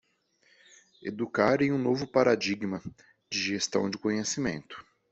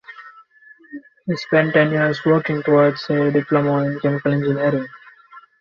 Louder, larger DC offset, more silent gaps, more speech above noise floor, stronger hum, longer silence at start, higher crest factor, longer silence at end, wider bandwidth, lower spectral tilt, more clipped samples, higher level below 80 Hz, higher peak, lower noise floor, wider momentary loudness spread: second, -28 LUFS vs -18 LUFS; neither; neither; first, 40 dB vs 31 dB; neither; first, 1 s vs 0.1 s; first, 22 dB vs 16 dB; about the same, 0.3 s vs 0.2 s; first, 8.2 kHz vs 7 kHz; second, -4.5 dB/octave vs -8 dB/octave; neither; about the same, -64 dBFS vs -60 dBFS; second, -8 dBFS vs -2 dBFS; first, -69 dBFS vs -49 dBFS; about the same, 16 LU vs 18 LU